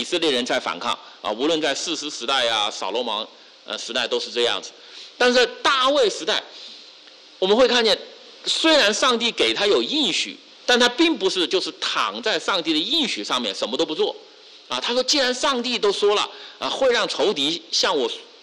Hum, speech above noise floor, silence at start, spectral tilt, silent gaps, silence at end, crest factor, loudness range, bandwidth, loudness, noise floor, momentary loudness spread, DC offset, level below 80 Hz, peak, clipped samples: none; 25 dB; 0 s; -1.5 dB/octave; none; 0.2 s; 14 dB; 4 LU; 12 kHz; -20 LUFS; -47 dBFS; 11 LU; under 0.1%; -62 dBFS; -8 dBFS; under 0.1%